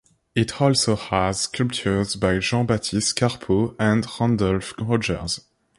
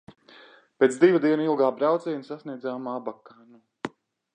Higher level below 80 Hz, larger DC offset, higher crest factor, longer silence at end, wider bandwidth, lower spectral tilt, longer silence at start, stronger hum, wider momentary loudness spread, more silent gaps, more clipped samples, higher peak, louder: first, -44 dBFS vs -76 dBFS; neither; about the same, 18 dB vs 20 dB; about the same, 0.4 s vs 0.45 s; first, 11.5 kHz vs 9.6 kHz; about the same, -5 dB/octave vs -6 dB/octave; second, 0.35 s vs 0.8 s; neither; second, 5 LU vs 19 LU; neither; neither; about the same, -4 dBFS vs -6 dBFS; about the same, -22 LUFS vs -24 LUFS